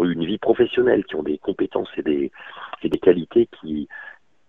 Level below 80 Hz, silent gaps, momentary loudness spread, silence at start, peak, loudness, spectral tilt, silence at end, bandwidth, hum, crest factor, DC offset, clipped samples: -54 dBFS; none; 17 LU; 0 s; 0 dBFS; -22 LUFS; -8.5 dB/octave; 0.35 s; 3.9 kHz; none; 20 dB; 0.1%; under 0.1%